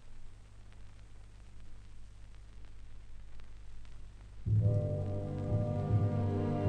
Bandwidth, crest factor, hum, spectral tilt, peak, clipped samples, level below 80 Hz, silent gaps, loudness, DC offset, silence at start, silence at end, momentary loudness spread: 5.4 kHz; 16 dB; 50 Hz at -50 dBFS; -9.5 dB/octave; -20 dBFS; under 0.1%; -48 dBFS; none; -34 LUFS; under 0.1%; 0 s; 0 s; 25 LU